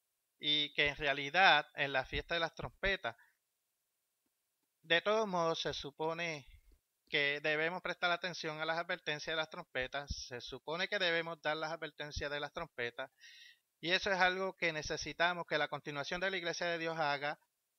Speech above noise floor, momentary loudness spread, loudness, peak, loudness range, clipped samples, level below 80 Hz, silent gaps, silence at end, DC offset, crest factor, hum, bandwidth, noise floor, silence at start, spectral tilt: 49 dB; 11 LU; -36 LUFS; -12 dBFS; 5 LU; under 0.1%; -60 dBFS; none; 0.45 s; under 0.1%; 26 dB; none; 16 kHz; -85 dBFS; 0.4 s; -3.5 dB/octave